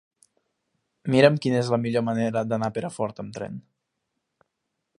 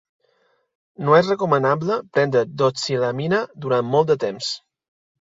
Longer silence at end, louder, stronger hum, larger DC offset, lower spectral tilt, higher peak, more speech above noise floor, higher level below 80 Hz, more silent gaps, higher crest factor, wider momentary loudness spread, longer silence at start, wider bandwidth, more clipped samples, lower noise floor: first, 1.4 s vs 0.65 s; second, -24 LUFS vs -20 LUFS; neither; neither; about the same, -6.5 dB/octave vs -5.5 dB/octave; about the same, -2 dBFS vs -2 dBFS; first, 57 dB vs 45 dB; about the same, -66 dBFS vs -64 dBFS; neither; first, 26 dB vs 18 dB; first, 17 LU vs 9 LU; about the same, 1.05 s vs 1 s; first, 11.5 kHz vs 7.8 kHz; neither; first, -80 dBFS vs -65 dBFS